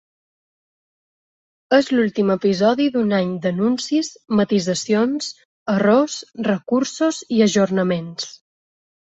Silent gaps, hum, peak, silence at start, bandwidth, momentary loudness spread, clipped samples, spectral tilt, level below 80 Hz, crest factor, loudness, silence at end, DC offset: 5.45-5.66 s; none; -2 dBFS; 1.7 s; 8.2 kHz; 8 LU; under 0.1%; -5 dB/octave; -62 dBFS; 18 dB; -19 LUFS; 0.7 s; under 0.1%